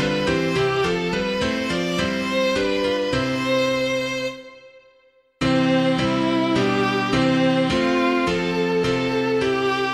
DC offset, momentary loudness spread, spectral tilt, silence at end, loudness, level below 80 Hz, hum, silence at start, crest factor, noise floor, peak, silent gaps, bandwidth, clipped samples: under 0.1%; 4 LU; -5.5 dB/octave; 0 s; -21 LUFS; -46 dBFS; none; 0 s; 14 dB; -58 dBFS; -6 dBFS; none; 13.5 kHz; under 0.1%